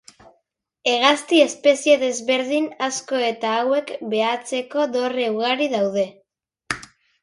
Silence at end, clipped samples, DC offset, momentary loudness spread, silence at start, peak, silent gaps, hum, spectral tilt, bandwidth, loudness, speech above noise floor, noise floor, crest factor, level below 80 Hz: 0.4 s; under 0.1%; under 0.1%; 9 LU; 0.85 s; -2 dBFS; none; none; -2.5 dB/octave; 11.5 kHz; -20 LUFS; 50 dB; -70 dBFS; 20 dB; -66 dBFS